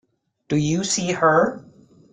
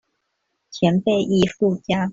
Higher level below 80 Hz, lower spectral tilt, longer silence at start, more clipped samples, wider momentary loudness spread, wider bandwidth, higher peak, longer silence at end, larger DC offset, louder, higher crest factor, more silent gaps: about the same, -56 dBFS vs -54 dBFS; second, -4.5 dB/octave vs -6.5 dB/octave; second, 0.5 s vs 0.7 s; neither; first, 8 LU vs 4 LU; first, 9.6 kHz vs 7.8 kHz; about the same, -4 dBFS vs -4 dBFS; first, 0.5 s vs 0 s; neither; about the same, -20 LUFS vs -20 LUFS; about the same, 18 dB vs 16 dB; neither